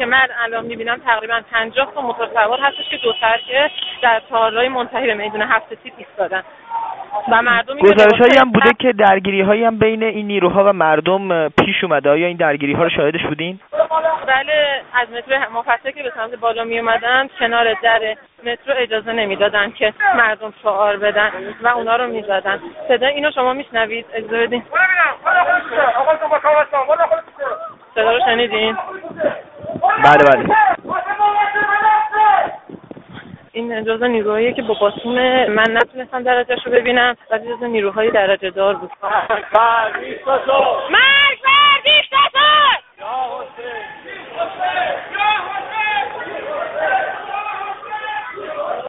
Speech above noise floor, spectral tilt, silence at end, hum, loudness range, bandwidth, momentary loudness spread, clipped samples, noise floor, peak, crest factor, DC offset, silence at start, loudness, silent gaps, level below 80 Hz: 21 dB; -1 dB/octave; 0 s; none; 6 LU; 4.3 kHz; 14 LU; under 0.1%; -37 dBFS; 0 dBFS; 16 dB; under 0.1%; 0 s; -15 LUFS; none; -54 dBFS